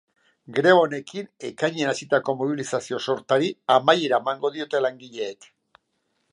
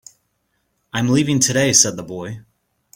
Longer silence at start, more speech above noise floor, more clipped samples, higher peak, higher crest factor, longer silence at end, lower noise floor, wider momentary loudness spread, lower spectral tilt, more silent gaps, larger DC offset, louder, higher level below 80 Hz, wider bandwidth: second, 0.5 s vs 0.95 s; about the same, 50 dB vs 52 dB; neither; about the same, -2 dBFS vs 0 dBFS; about the same, 22 dB vs 20 dB; first, 1 s vs 0.55 s; first, -73 dBFS vs -69 dBFS; second, 15 LU vs 18 LU; first, -4.5 dB/octave vs -3 dB/octave; neither; neither; second, -23 LUFS vs -15 LUFS; second, -76 dBFS vs -54 dBFS; second, 11 kHz vs 16.5 kHz